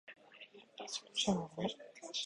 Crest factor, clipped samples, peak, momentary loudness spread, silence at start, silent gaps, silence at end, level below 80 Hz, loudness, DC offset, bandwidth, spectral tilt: 22 dB; under 0.1%; -20 dBFS; 20 LU; 0.05 s; none; 0 s; -72 dBFS; -39 LUFS; under 0.1%; 11 kHz; -3.5 dB/octave